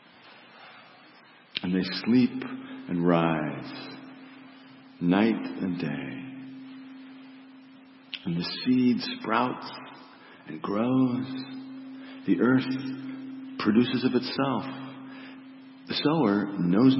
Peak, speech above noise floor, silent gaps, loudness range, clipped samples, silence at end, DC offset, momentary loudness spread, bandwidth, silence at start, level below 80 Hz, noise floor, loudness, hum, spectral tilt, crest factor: -8 dBFS; 29 dB; none; 4 LU; under 0.1%; 0 s; under 0.1%; 23 LU; 5.8 kHz; 0.25 s; -70 dBFS; -54 dBFS; -27 LUFS; none; -10.5 dB/octave; 20 dB